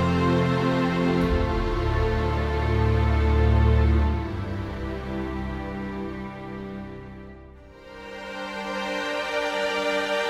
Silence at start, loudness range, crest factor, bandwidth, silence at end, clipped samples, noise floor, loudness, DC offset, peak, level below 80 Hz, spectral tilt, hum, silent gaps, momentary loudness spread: 0 s; 12 LU; 14 dB; 10.5 kHz; 0 s; under 0.1%; -45 dBFS; -25 LUFS; under 0.1%; -10 dBFS; -28 dBFS; -7 dB/octave; none; none; 16 LU